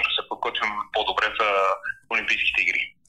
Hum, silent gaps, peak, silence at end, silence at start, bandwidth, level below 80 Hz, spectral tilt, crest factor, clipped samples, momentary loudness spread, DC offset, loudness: none; none; -8 dBFS; 0.2 s; 0 s; 13.5 kHz; -56 dBFS; -1.5 dB/octave; 16 dB; under 0.1%; 6 LU; under 0.1%; -23 LUFS